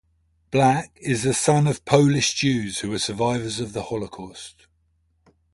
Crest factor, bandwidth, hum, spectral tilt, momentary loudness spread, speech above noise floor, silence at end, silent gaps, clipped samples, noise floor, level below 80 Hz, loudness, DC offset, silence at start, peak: 22 dB; 11.5 kHz; none; -4.5 dB/octave; 16 LU; 45 dB; 1.05 s; none; under 0.1%; -66 dBFS; -52 dBFS; -22 LUFS; under 0.1%; 0.5 s; -2 dBFS